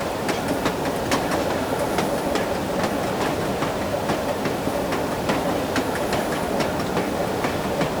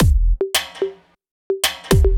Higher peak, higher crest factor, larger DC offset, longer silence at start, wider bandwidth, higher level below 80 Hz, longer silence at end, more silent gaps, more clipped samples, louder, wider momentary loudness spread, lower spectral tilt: second, -8 dBFS vs -2 dBFS; about the same, 14 dB vs 14 dB; neither; about the same, 0 s vs 0 s; about the same, over 20 kHz vs 20 kHz; second, -44 dBFS vs -20 dBFS; about the same, 0 s vs 0 s; second, none vs 1.31-1.50 s; neither; second, -24 LUFS vs -20 LUFS; second, 2 LU vs 10 LU; about the same, -5 dB/octave vs -4.5 dB/octave